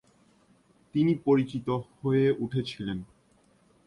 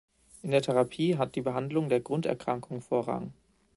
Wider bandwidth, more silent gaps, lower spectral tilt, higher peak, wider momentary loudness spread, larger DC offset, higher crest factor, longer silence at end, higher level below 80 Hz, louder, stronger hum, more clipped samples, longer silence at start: about the same, 11 kHz vs 11.5 kHz; neither; first, -8.5 dB/octave vs -7 dB/octave; about the same, -12 dBFS vs -12 dBFS; about the same, 10 LU vs 9 LU; neither; about the same, 18 dB vs 18 dB; first, 0.8 s vs 0.45 s; first, -60 dBFS vs -66 dBFS; about the same, -28 LUFS vs -30 LUFS; neither; neither; first, 0.95 s vs 0.45 s